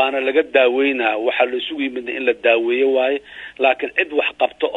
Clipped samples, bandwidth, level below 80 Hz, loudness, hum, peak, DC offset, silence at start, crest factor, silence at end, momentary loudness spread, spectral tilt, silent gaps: under 0.1%; 4.1 kHz; -62 dBFS; -18 LUFS; 60 Hz at -65 dBFS; -2 dBFS; under 0.1%; 0 s; 16 dB; 0 s; 7 LU; -4.5 dB/octave; none